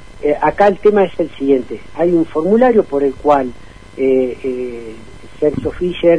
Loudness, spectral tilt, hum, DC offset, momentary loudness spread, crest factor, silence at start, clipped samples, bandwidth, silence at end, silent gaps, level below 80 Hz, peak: -15 LUFS; -7.5 dB/octave; none; 2%; 13 LU; 14 dB; 0.15 s; under 0.1%; 10 kHz; 0 s; none; -40 dBFS; 0 dBFS